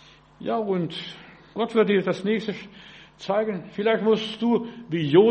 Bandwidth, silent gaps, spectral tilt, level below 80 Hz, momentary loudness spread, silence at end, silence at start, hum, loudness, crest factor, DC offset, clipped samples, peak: 8.4 kHz; none; -7 dB/octave; -64 dBFS; 17 LU; 0 s; 0.4 s; none; -24 LUFS; 20 dB; under 0.1%; under 0.1%; -4 dBFS